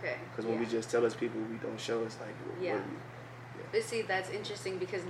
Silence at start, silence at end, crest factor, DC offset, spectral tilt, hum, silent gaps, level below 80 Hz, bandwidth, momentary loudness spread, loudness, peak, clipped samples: 0 s; 0 s; 16 dB; under 0.1%; -5 dB/octave; none; none; -72 dBFS; 14 kHz; 12 LU; -36 LUFS; -18 dBFS; under 0.1%